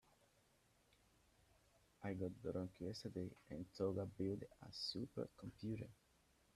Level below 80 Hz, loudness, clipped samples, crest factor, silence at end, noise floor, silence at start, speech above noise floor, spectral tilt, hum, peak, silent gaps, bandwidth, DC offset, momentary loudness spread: -74 dBFS; -49 LUFS; under 0.1%; 20 dB; 0.6 s; -77 dBFS; 2 s; 29 dB; -6.5 dB/octave; none; -30 dBFS; none; 14 kHz; under 0.1%; 9 LU